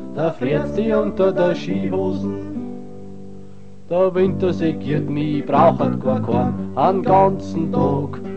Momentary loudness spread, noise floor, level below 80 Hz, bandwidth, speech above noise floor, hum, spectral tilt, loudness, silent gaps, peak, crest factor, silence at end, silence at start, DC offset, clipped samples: 15 LU; -42 dBFS; -46 dBFS; 8.2 kHz; 23 dB; none; -8.5 dB/octave; -19 LUFS; none; 0 dBFS; 18 dB; 0 s; 0 s; 2%; under 0.1%